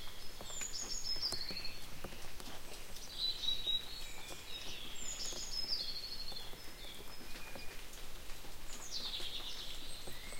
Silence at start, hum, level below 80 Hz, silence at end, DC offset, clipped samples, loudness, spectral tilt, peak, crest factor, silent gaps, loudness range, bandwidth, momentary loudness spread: 0 s; none; -50 dBFS; 0 s; under 0.1%; under 0.1%; -42 LUFS; -1 dB/octave; -22 dBFS; 18 dB; none; 6 LU; 16.5 kHz; 13 LU